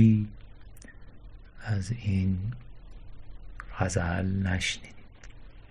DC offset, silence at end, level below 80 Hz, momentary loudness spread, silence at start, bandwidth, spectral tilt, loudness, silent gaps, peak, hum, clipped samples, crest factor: under 0.1%; 0.05 s; -42 dBFS; 24 LU; 0 s; 11.5 kHz; -6 dB/octave; -30 LUFS; none; -8 dBFS; none; under 0.1%; 20 dB